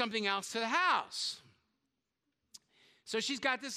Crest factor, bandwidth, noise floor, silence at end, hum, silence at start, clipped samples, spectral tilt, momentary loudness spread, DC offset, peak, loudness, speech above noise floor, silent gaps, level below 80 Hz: 20 dB; 15.5 kHz; -85 dBFS; 0 s; none; 0 s; under 0.1%; -1.5 dB/octave; 9 LU; under 0.1%; -16 dBFS; -34 LUFS; 51 dB; none; -84 dBFS